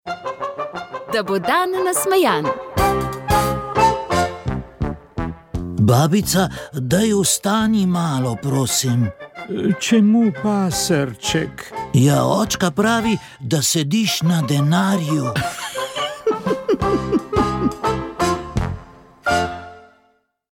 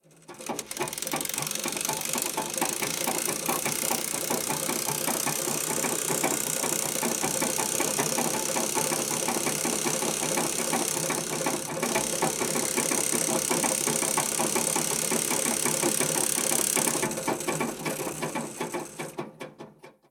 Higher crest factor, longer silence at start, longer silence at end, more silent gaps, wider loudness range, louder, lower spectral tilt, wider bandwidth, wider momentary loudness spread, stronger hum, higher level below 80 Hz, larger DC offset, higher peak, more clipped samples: second, 16 dB vs 22 dB; second, 0.05 s vs 0.3 s; first, 0.7 s vs 0.2 s; neither; about the same, 3 LU vs 3 LU; first, -19 LUFS vs -26 LUFS; first, -5 dB/octave vs -2 dB/octave; second, 18 kHz vs over 20 kHz; first, 11 LU vs 8 LU; neither; first, -38 dBFS vs -64 dBFS; neither; first, -2 dBFS vs -8 dBFS; neither